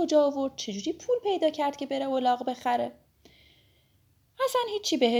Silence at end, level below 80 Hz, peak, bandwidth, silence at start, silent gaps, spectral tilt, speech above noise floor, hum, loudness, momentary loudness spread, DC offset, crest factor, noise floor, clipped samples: 0 s; -70 dBFS; -10 dBFS; over 20 kHz; 0 s; none; -3.5 dB/octave; 39 dB; none; -28 LUFS; 7 LU; under 0.1%; 18 dB; -66 dBFS; under 0.1%